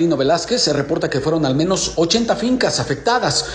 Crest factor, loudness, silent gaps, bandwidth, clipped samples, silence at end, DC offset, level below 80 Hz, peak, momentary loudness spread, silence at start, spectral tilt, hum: 16 dB; -17 LUFS; none; 11 kHz; under 0.1%; 0 s; under 0.1%; -42 dBFS; -2 dBFS; 3 LU; 0 s; -4 dB/octave; none